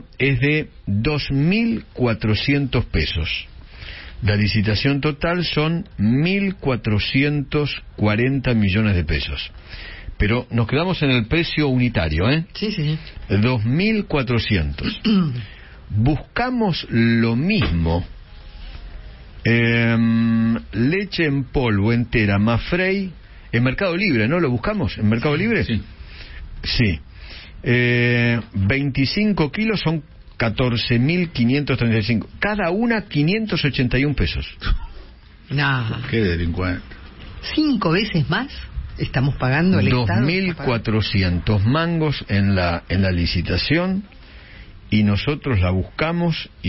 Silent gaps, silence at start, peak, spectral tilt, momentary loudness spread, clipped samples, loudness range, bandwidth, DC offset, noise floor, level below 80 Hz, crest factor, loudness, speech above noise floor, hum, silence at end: none; 0 s; -6 dBFS; -10 dB/octave; 10 LU; under 0.1%; 2 LU; 5.8 kHz; under 0.1%; -42 dBFS; -34 dBFS; 14 dB; -20 LUFS; 23 dB; none; 0 s